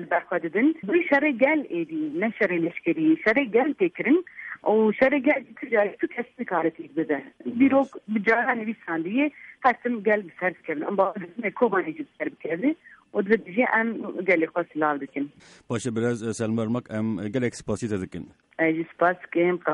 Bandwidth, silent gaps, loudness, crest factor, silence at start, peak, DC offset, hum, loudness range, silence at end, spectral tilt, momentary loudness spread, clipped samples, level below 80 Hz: 11 kHz; none; -25 LUFS; 18 dB; 0 s; -8 dBFS; under 0.1%; none; 5 LU; 0 s; -6.5 dB/octave; 10 LU; under 0.1%; -64 dBFS